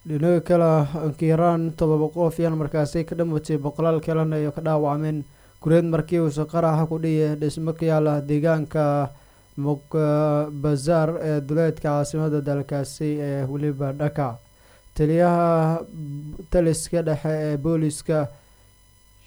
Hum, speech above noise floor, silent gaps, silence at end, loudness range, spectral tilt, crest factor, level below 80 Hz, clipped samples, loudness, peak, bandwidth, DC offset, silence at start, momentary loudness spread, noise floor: none; 33 dB; none; 0.9 s; 3 LU; -7.5 dB/octave; 16 dB; -46 dBFS; under 0.1%; -23 LUFS; -6 dBFS; over 20 kHz; under 0.1%; 0.05 s; 8 LU; -54 dBFS